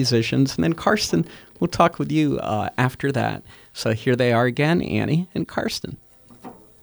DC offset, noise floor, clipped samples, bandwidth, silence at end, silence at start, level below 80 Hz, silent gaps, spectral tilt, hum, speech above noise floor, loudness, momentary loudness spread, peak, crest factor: under 0.1%; -43 dBFS; under 0.1%; over 20 kHz; 0.3 s; 0 s; -50 dBFS; none; -5.5 dB/octave; none; 22 dB; -22 LUFS; 13 LU; -2 dBFS; 18 dB